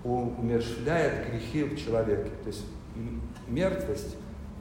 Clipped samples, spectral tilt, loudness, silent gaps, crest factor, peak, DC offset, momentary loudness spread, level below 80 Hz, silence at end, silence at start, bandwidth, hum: under 0.1%; -6.5 dB/octave; -31 LUFS; none; 16 dB; -14 dBFS; under 0.1%; 13 LU; -44 dBFS; 0 s; 0 s; 16 kHz; none